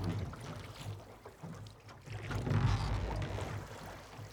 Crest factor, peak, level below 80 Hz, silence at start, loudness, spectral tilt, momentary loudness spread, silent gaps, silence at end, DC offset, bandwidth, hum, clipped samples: 18 dB; -20 dBFS; -46 dBFS; 0 s; -40 LUFS; -6.5 dB/octave; 17 LU; none; 0 s; under 0.1%; 18 kHz; none; under 0.1%